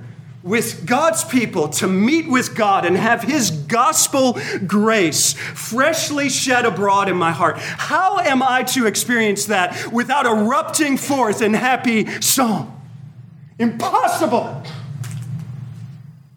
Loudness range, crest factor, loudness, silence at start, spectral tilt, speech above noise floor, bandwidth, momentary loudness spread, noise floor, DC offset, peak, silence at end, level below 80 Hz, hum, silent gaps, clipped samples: 4 LU; 16 dB; -17 LUFS; 0 s; -3.5 dB/octave; 23 dB; over 20 kHz; 14 LU; -40 dBFS; under 0.1%; -2 dBFS; 0.25 s; -64 dBFS; none; none; under 0.1%